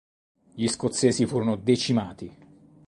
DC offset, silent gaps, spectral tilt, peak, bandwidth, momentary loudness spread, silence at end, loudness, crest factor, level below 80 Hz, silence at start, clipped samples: under 0.1%; none; -5 dB/octave; -6 dBFS; 11.5 kHz; 16 LU; 0.6 s; -25 LUFS; 20 dB; -58 dBFS; 0.55 s; under 0.1%